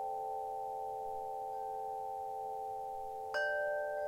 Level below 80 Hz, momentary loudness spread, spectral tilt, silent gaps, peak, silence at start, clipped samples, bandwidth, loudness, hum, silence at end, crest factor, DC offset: -70 dBFS; 6 LU; -2.5 dB/octave; none; -26 dBFS; 0 s; under 0.1%; 16.5 kHz; -40 LUFS; none; 0 s; 14 dB; under 0.1%